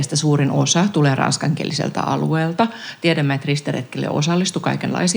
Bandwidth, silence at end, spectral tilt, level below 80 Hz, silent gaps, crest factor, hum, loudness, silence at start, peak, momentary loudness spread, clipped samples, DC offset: over 20 kHz; 0 s; -5 dB/octave; -70 dBFS; none; 16 dB; none; -19 LUFS; 0 s; -2 dBFS; 6 LU; under 0.1%; under 0.1%